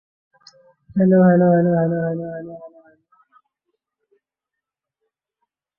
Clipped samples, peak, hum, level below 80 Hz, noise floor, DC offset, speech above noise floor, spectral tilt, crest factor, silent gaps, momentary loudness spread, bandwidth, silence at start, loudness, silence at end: under 0.1%; -4 dBFS; none; -62 dBFS; -85 dBFS; under 0.1%; 69 dB; -11 dB/octave; 18 dB; none; 20 LU; 5.4 kHz; 0.95 s; -17 LUFS; 3.1 s